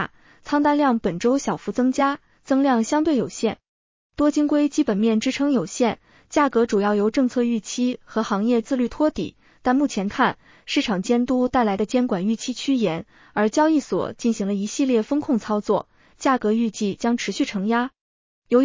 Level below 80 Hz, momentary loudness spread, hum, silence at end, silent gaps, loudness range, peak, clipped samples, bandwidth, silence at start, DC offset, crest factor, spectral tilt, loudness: -54 dBFS; 6 LU; none; 0 s; 3.69-4.10 s, 18.01-18.42 s; 2 LU; -4 dBFS; under 0.1%; 7.6 kHz; 0 s; under 0.1%; 16 dB; -5 dB/octave; -22 LUFS